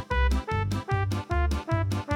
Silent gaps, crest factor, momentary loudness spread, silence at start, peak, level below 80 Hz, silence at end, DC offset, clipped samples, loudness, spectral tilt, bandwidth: none; 14 dB; 2 LU; 0 s; -12 dBFS; -30 dBFS; 0 s; under 0.1%; under 0.1%; -28 LUFS; -6.5 dB/octave; 13.5 kHz